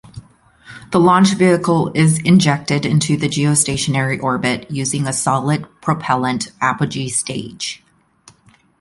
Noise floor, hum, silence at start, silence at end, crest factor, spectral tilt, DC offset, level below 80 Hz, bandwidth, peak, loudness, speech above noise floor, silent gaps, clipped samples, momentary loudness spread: -52 dBFS; none; 0.15 s; 1.05 s; 16 dB; -5 dB/octave; under 0.1%; -50 dBFS; 11.5 kHz; 0 dBFS; -16 LUFS; 36 dB; none; under 0.1%; 9 LU